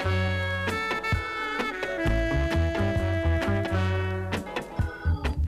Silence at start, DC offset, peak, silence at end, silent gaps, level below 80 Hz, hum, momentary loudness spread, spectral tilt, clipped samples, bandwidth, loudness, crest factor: 0 s; under 0.1%; -12 dBFS; 0 s; none; -34 dBFS; none; 5 LU; -6.5 dB/octave; under 0.1%; 13.5 kHz; -27 LUFS; 14 dB